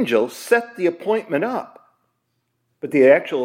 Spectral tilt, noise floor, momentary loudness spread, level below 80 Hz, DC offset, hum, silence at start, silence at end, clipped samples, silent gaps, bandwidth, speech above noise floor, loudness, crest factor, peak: -5.5 dB/octave; -72 dBFS; 11 LU; -78 dBFS; under 0.1%; none; 0 s; 0 s; under 0.1%; none; 16.5 kHz; 53 dB; -19 LUFS; 18 dB; -2 dBFS